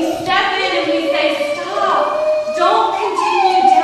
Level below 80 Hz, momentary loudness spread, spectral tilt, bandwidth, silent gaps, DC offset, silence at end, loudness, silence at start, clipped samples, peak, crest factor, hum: -54 dBFS; 4 LU; -3 dB/octave; 13.5 kHz; none; under 0.1%; 0 s; -15 LUFS; 0 s; under 0.1%; -2 dBFS; 14 dB; none